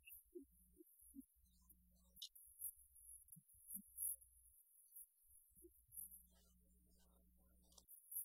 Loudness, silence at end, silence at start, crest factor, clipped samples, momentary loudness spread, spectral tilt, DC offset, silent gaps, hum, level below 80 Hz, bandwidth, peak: -55 LUFS; 0 s; 0 s; 26 dB; under 0.1%; 22 LU; -1.5 dB/octave; under 0.1%; none; none; -78 dBFS; 16 kHz; -34 dBFS